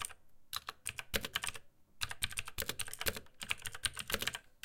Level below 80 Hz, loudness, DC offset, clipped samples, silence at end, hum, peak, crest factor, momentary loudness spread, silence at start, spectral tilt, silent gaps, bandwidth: -58 dBFS; -40 LUFS; under 0.1%; under 0.1%; 0.1 s; none; -12 dBFS; 30 dB; 7 LU; 0 s; -1 dB/octave; none; 17 kHz